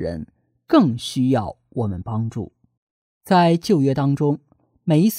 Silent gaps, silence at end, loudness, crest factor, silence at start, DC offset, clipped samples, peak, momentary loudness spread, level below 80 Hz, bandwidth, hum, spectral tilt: 2.77-3.21 s; 0 s; -20 LUFS; 18 dB; 0 s; under 0.1%; under 0.1%; -2 dBFS; 14 LU; -52 dBFS; 16 kHz; none; -7 dB/octave